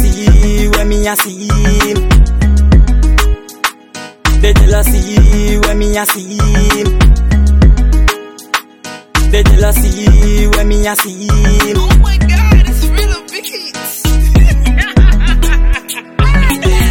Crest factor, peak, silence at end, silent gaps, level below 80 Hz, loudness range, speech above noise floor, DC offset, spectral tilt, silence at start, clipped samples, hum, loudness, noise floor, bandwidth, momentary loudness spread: 8 dB; 0 dBFS; 0 s; none; -10 dBFS; 1 LU; 20 dB; under 0.1%; -5 dB/octave; 0 s; under 0.1%; none; -11 LUFS; -30 dBFS; 18 kHz; 9 LU